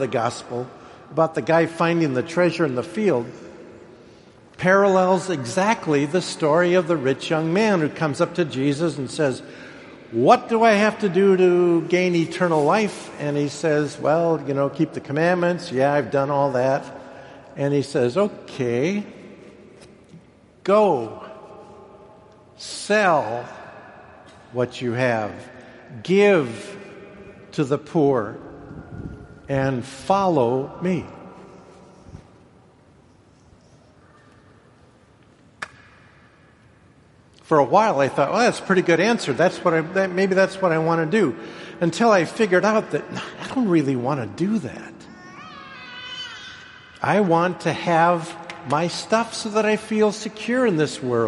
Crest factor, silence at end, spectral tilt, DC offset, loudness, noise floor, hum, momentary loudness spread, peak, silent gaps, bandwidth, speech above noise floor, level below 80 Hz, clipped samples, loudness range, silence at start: 20 dB; 0 s; -6 dB/octave; under 0.1%; -21 LUFS; -53 dBFS; none; 21 LU; -2 dBFS; none; 11.5 kHz; 33 dB; -60 dBFS; under 0.1%; 7 LU; 0 s